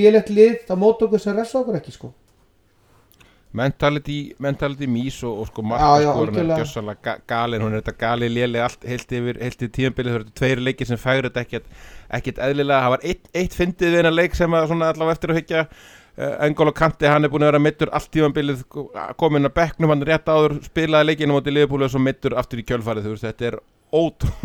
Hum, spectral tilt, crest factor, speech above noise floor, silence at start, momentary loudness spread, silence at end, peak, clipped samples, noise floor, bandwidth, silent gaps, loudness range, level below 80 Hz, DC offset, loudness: none; -6.5 dB/octave; 18 dB; 38 dB; 0 s; 12 LU; 0.05 s; -2 dBFS; under 0.1%; -58 dBFS; 17.5 kHz; none; 5 LU; -40 dBFS; under 0.1%; -20 LUFS